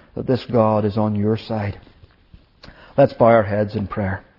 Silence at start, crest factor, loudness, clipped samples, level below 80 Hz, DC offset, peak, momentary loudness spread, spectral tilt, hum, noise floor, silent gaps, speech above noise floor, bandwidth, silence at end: 0.15 s; 18 dB; -19 LUFS; under 0.1%; -50 dBFS; under 0.1%; -2 dBFS; 11 LU; -10 dB/octave; none; -50 dBFS; none; 32 dB; 5.8 kHz; 0.2 s